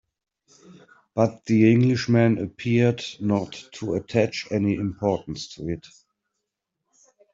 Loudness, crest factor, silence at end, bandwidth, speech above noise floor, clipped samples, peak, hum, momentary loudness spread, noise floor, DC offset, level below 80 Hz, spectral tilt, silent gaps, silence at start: -23 LUFS; 20 dB; 1.55 s; 7.8 kHz; 59 dB; under 0.1%; -6 dBFS; none; 14 LU; -82 dBFS; under 0.1%; -58 dBFS; -7 dB/octave; none; 0.7 s